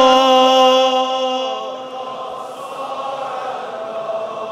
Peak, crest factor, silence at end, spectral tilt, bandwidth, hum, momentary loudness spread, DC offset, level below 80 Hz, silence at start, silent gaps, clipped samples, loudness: 0 dBFS; 16 dB; 0 s; -2 dB/octave; 13.5 kHz; none; 17 LU; under 0.1%; -64 dBFS; 0 s; none; under 0.1%; -17 LUFS